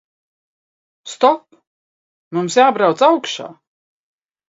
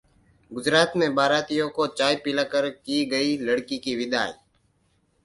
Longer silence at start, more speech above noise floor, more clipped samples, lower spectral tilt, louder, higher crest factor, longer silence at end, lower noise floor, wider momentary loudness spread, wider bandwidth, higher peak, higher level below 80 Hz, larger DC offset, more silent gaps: first, 1.05 s vs 0.5 s; first, over 75 dB vs 43 dB; neither; about the same, -4 dB/octave vs -4 dB/octave; first, -16 LUFS vs -24 LUFS; about the same, 18 dB vs 22 dB; about the same, 0.95 s vs 0.9 s; first, under -90 dBFS vs -67 dBFS; first, 15 LU vs 7 LU; second, 7.8 kHz vs 11.5 kHz; first, 0 dBFS vs -4 dBFS; second, -74 dBFS vs -64 dBFS; neither; first, 1.67-2.31 s vs none